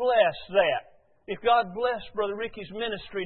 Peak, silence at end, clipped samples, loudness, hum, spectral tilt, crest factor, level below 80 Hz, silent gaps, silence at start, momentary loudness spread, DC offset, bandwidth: -8 dBFS; 0 s; under 0.1%; -27 LUFS; none; -8 dB/octave; 18 dB; -58 dBFS; none; 0 s; 10 LU; under 0.1%; 4.4 kHz